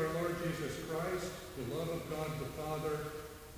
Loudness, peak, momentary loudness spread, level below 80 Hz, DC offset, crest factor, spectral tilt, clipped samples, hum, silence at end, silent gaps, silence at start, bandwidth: -39 LUFS; -24 dBFS; 7 LU; -56 dBFS; under 0.1%; 16 dB; -5.5 dB/octave; under 0.1%; none; 0 s; none; 0 s; 16 kHz